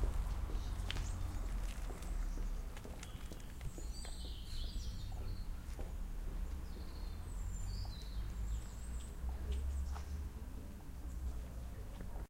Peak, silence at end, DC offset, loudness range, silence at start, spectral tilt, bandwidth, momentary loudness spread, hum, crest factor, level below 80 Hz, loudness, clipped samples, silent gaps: -22 dBFS; 0 s; under 0.1%; 3 LU; 0 s; -5 dB/octave; 16 kHz; 7 LU; none; 20 dB; -42 dBFS; -46 LUFS; under 0.1%; none